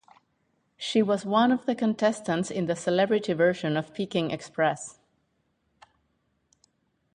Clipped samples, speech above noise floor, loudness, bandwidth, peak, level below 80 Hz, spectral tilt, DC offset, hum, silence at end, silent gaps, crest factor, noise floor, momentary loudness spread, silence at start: under 0.1%; 48 dB; -26 LUFS; 10.5 kHz; -8 dBFS; -70 dBFS; -5.5 dB/octave; under 0.1%; none; 2.25 s; none; 20 dB; -73 dBFS; 7 LU; 0.8 s